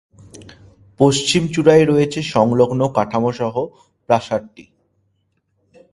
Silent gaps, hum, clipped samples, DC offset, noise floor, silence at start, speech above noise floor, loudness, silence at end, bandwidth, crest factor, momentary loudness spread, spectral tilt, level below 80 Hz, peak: none; none; under 0.1%; under 0.1%; -67 dBFS; 0.35 s; 51 dB; -16 LUFS; 1.3 s; 11.5 kHz; 18 dB; 11 LU; -5.5 dB/octave; -52 dBFS; 0 dBFS